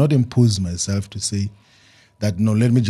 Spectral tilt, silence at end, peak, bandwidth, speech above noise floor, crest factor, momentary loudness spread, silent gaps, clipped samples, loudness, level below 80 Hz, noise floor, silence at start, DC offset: -6 dB/octave; 0 s; -4 dBFS; 12.5 kHz; 34 dB; 16 dB; 9 LU; none; under 0.1%; -20 LUFS; -48 dBFS; -53 dBFS; 0 s; under 0.1%